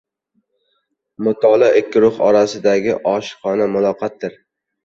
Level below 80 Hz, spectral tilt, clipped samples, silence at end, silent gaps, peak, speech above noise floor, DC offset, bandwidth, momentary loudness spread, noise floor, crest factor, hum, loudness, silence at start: -60 dBFS; -5.5 dB/octave; under 0.1%; 0.55 s; none; -2 dBFS; 54 dB; under 0.1%; 7.8 kHz; 11 LU; -69 dBFS; 16 dB; none; -16 LUFS; 1.2 s